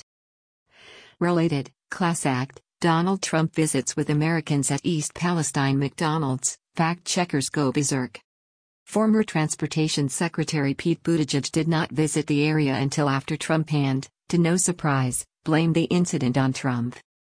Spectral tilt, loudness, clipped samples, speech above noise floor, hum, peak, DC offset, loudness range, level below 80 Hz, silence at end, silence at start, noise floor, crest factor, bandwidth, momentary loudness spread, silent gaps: -5 dB/octave; -24 LUFS; under 0.1%; 27 dB; none; -8 dBFS; under 0.1%; 2 LU; -60 dBFS; 0.35 s; 0.9 s; -50 dBFS; 16 dB; 10.5 kHz; 5 LU; 8.24-8.86 s